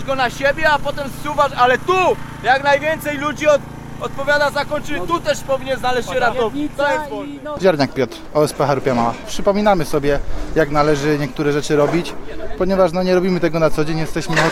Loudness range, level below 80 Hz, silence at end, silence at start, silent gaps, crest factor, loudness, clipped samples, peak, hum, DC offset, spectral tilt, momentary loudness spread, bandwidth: 2 LU; -34 dBFS; 0 s; 0 s; none; 16 dB; -18 LUFS; under 0.1%; 0 dBFS; none; under 0.1%; -5 dB/octave; 8 LU; 16 kHz